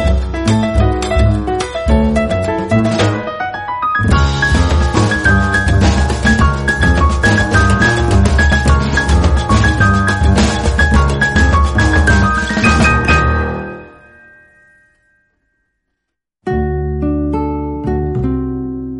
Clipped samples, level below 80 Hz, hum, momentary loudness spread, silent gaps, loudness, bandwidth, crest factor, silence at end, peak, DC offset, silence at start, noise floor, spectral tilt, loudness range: under 0.1%; -18 dBFS; none; 8 LU; none; -13 LUFS; 11.5 kHz; 12 dB; 0 s; 0 dBFS; under 0.1%; 0 s; -75 dBFS; -6 dB/octave; 10 LU